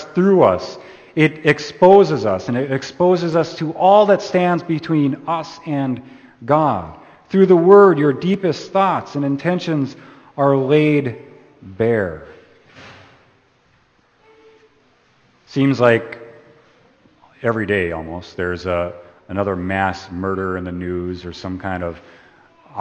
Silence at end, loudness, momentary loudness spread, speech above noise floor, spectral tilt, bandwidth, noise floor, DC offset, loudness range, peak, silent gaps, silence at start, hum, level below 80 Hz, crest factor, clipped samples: 0 s; -17 LUFS; 16 LU; 41 dB; -7.5 dB/octave; 8.4 kHz; -57 dBFS; under 0.1%; 9 LU; 0 dBFS; none; 0 s; none; -52 dBFS; 18 dB; under 0.1%